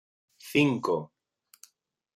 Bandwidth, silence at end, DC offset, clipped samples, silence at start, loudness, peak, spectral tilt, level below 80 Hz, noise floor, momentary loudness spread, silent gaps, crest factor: 15.5 kHz; 1.1 s; under 0.1%; under 0.1%; 0.45 s; -27 LUFS; -10 dBFS; -6 dB/octave; -72 dBFS; -73 dBFS; 24 LU; none; 22 dB